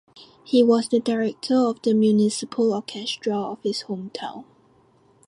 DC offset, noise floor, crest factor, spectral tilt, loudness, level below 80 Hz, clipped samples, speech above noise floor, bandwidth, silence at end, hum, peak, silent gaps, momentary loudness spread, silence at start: under 0.1%; -58 dBFS; 16 dB; -5.5 dB/octave; -22 LUFS; -68 dBFS; under 0.1%; 36 dB; 11.5 kHz; 0.85 s; none; -6 dBFS; none; 14 LU; 0.15 s